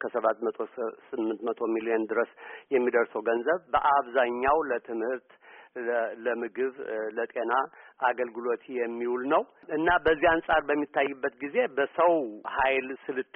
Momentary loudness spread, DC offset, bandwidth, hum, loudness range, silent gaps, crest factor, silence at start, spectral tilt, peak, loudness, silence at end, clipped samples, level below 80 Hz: 10 LU; under 0.1%; 3.8 kHz; none; 5 LU; none; 18 dB; 0 s; 1.5 dB/octave; -10 dBFS; -28 LUFS; 0.15 s; under 0.1%; -58 dBFS